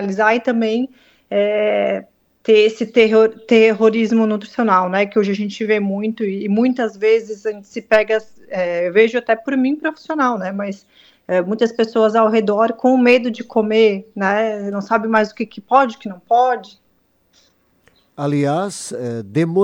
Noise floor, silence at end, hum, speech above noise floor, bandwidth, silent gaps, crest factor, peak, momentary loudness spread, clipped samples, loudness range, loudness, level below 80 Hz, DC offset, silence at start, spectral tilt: -61 dBFS; 0 s; none; 45 dB; 11 kHz; none; 16 dB; 0 dBFS; 12 LU; under 0.1%; 5 LU; -17 LUFS; -64 dBFS; under 0.1%; 0 s; -6 dB/octave